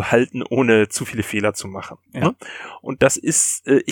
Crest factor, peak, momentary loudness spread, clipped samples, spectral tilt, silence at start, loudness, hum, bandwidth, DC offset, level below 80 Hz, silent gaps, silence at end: 18 dB; -2 dBFS; 17 LU; under 0.1%; -4 dB/octave; 0 s; -19 LUFS; none; 18 kHz; under 0.1%; -54 dBFS; none; 0 s